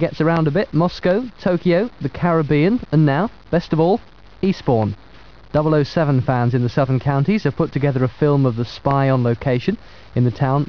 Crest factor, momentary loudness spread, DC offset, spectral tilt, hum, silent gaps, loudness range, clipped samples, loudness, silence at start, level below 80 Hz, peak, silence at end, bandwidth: 14 dB; 6 LU; 0.7%; -9 dB/octave; none; none; 1 LU; under 0.1%; -18 LUFS; 0 s; -44 dBFS; -4 dBFS; 0 s; 5.4 kHz